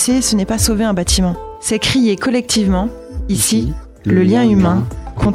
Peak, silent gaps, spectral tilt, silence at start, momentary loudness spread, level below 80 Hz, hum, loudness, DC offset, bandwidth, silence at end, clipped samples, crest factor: 0 dBFS; none; -4.5 dB/octave; 0 s; 10 LU; -28 dBFS; none; -15 LUFS; under 0.1%; 16 kHz; 0 s; under 0.1%; 14 dB